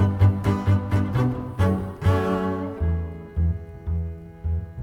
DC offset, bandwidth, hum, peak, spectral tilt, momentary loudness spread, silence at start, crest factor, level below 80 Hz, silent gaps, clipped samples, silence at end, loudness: under 0.1%; 6.8 kHz; none; -8 dBFS; -9 dB/octave; 10 LU; 0 s; 16 dB; -34 dBFS; none; under 0.1%; 0 s; -24 LUFS